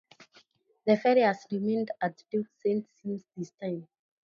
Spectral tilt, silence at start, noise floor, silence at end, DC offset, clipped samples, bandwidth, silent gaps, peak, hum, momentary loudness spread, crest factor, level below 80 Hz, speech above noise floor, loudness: -7 dB/octave; 0.2 s; -64 dBFS; 0.4 s; under 0.1%; under 0.1%; 7.2 kHz; none; -10 dBFS; none; 14 LU; 20 dB; -80 dBFS; 35 dB; -30 LUFS